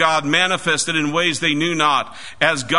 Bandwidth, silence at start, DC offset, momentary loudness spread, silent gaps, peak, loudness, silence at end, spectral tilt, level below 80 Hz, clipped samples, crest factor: 11 kHz; 0 s; 1%; 3 LU; none; 0 dBFS; -17 LUFS; 0 s; -3 dB/octave; -56 dBFS; under 0.1%; 18 dB